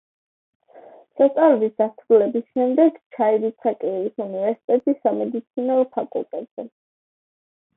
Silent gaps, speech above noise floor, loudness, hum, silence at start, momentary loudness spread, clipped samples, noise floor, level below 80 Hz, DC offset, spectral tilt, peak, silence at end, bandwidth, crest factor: 3.06-3.10 s, 4.64-4.68 s, 6.51-6.57 s; 27 dB; -21 LUFS; none; 0.75 s; 12 LU; under 0.1%; -47 dBFS; -76 dBFS; under 0.1%; -11 dB/octave; -4 dBFS; 1.1 s; 3.9 kHz; 18 dB